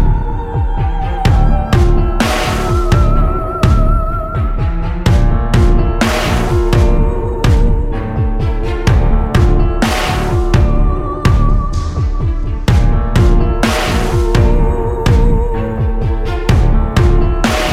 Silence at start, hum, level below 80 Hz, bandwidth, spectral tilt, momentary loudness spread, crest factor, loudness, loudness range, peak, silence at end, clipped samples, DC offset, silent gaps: 0 s; none; -14 dBFS; 14 kHz; -6.5 dB/octave; 6 LU; 12 dB; -14 LUFS; 1 LU; 0 dBFS; 0 s; under 0.1%; under 0.1%; none